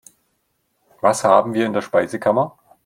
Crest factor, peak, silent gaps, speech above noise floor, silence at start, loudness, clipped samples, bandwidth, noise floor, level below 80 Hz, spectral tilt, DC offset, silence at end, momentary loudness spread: 20 dB; 0 dBFS; none; 52 dB; 1.05 s; -18 LUFS; under 0.1%; 16 kHz; -69 dBFS; -64 dBFS; -5 dB/octave; under 0.1%; 0.35 s; 6 LU